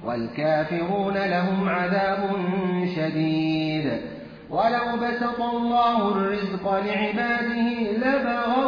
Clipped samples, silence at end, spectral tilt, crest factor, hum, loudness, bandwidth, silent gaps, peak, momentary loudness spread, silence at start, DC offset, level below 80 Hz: under 0.1%; 0 s; -8 dB/octave; 12 dB; none; -24 LUFS; 5.2 kHz; none; -10 dBFS; 4 LU; 0 s; under 0.1%; -56 dBFS